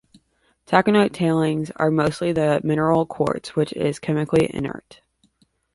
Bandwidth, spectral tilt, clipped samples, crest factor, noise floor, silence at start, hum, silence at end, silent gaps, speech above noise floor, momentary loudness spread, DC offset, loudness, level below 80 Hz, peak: 11.5 kHz; -7 dB/octave; under 0.1%; 20 dB; -64 dBFS; 0.7 s; none; 0.95 s; none; 44 dB; 6 LU; under 0.1%; -21 LUFS; -54 dBFS; -2 dBFS